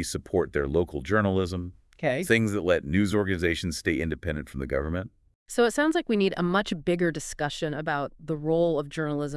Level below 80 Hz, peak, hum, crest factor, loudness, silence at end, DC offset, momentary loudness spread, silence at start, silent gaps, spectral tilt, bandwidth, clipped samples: -46 dBFS; -6 dBFS; none; 20 dB; -27 LUFS; 0 s; under 0.1%; 9 LU; 0 s; 5.35-5.46 s; -5.5 dB/octave; 12 kHz; under 0.1%